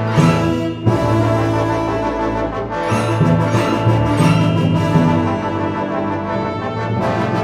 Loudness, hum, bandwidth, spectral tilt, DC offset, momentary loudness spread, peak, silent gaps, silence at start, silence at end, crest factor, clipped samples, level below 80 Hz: -17 LUFS; none; 13 kHz; -7 dB/octave; under 0.1%; 7 LU; -2 dBFS; none; 0 s; 0 s; 14 dB; under 0.1%; -36 dBFS